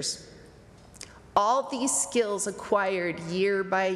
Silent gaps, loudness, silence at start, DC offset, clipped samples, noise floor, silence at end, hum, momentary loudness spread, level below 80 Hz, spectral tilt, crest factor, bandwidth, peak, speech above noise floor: none; -27 LUFS; 0 s; under 0.1%; under 0.1%; -51 dBFS; 0 s; none; 14 LU; -62 dBFS; -3 dB/octave; 18 dB; 14 kHz; -10 dBFS; 24 dB